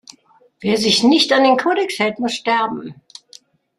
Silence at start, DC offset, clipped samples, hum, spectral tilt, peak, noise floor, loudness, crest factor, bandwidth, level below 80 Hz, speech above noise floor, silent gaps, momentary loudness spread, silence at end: 0.6 s; under 0.1%; under 0.1%; none; -3.5 dB/octave; -2 dBFS; -52 dBFS; -16 LUFS; 16 dB; 13.5 kHz; -62 dBFS; 36 dB; none; 12 LU; 0.85 s